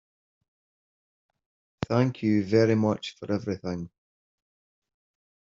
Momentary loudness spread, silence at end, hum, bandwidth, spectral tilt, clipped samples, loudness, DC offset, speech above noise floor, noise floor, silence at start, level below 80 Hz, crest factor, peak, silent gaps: 14 LU; 1.7 s; none; 7.6 kHz; -7 dB/octave; under 0.1%; -26 LUFS; under 0.1%; over 65 dB; under -90 dBFS; 1.8 s; -62 dBFS; 22 dB; -8 dBFS; none